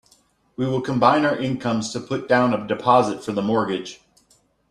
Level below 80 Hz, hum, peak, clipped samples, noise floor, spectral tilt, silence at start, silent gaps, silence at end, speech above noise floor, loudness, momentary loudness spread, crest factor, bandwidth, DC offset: -58 dBFS; none; -2 dBFS; under 0.1%; -61 dBFS; -6 dB/octave; 0.6 s; none; 0.75 s; 40 dB; -21 LUFS; 10 LU; 20 dB; 11.5 kHz; under 0.1%